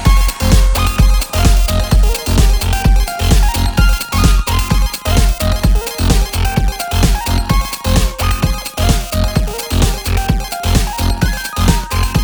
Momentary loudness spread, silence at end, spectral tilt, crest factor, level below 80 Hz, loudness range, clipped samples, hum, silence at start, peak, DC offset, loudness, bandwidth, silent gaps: 4 LU; 0 s; -4.5 dB/octave; 12 dB; -14 dBFS; 3 LU; under 0.1%; none; 0 s; 0 dBFS; under 0.1%; -15 LUFS; over 20 kHz; none